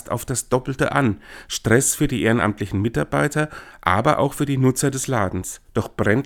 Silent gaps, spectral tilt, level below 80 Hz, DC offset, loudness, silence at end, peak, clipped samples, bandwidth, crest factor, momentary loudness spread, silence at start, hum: none; -5 dB/octave; -44 dBFS; under 0.1%; -21 LUFS; 0 s; 0 dBFS; under 0.1%; 18.5 kHz; 20 dB; 9 LU; 0.05 s; none